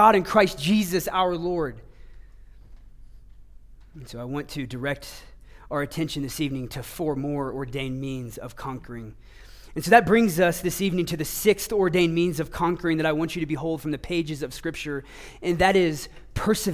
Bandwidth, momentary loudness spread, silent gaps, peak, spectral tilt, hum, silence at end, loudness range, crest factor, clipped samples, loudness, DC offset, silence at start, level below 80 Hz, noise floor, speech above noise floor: 16 kHz; 16 LU; none; -2 dBFS; -5 dB/octave; none; 0 s; 13 LU; 22 dB; under 0.1%; -25 LUFS; under 0.1%; 0 s; -46 dBFS; -47 dBFS; 22 dB